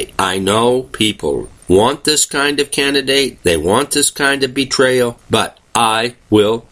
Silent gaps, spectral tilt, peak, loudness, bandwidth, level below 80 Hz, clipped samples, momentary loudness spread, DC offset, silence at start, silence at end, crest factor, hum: none; -3 dB/octave; 0 dBFS; -14 LUFS; 15.5 kHz; -42 dBFS; under 0.1%; 4 LU; under 0.1%; 0 s; 0.1 s; 14 dB; none